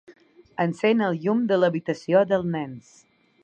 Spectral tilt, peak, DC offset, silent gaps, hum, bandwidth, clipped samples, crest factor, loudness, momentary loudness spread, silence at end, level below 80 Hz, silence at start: -7.5 dB/octave; -6 dBFS; under 0.1%; none; none; 8.8 kHz; under 0.1%; 18 dB; -23 LUFS; 13 LU; 0.65 s; -66 dBFS; 0.1 s